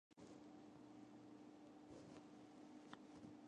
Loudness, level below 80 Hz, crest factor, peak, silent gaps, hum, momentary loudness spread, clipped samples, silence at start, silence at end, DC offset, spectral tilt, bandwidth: -62 LUFS; -86 dBFS; 24 dB; -38 dBFS; none; none; 2 LU; under 0.1%; 0.1 s; 0 s; under 0.1%; -5.5 dB/octave; 10 kHz